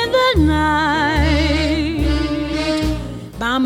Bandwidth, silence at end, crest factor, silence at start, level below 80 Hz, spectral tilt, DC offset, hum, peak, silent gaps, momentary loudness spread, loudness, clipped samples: 15 kHz; 0 s; 14 dB; 0 s; -26 dBFS; -6 dB/octave; under 0.1%; none; -2 dBFS; none; 8 LU; -17 LUFS; under 0.1%